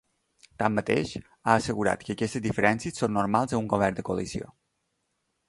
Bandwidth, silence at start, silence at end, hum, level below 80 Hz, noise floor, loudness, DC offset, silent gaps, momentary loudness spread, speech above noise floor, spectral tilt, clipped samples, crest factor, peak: 11.5 kHz; 0.6 s; 1.05 s; none; -54 dBFS; -77 dBFS; -27 LUFS; under 0.1%; none; 8 LU; 50 dB; -5.5 dB/octave; under 0.1%; 24 dB; -4 dBFS